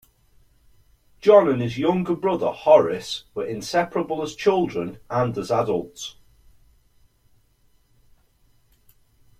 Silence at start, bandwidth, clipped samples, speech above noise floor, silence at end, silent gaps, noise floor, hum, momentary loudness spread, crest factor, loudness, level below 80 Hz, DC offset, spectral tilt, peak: 1.25 s; 14.5 kHz; under 0.1%; 40 dB; 3.3 s; none; -61 dBFS; none; 14 LU; 20 dB; -21 LUFS; -58 dBFS; under 0.1%; -6 dB/octave; -2 dBFS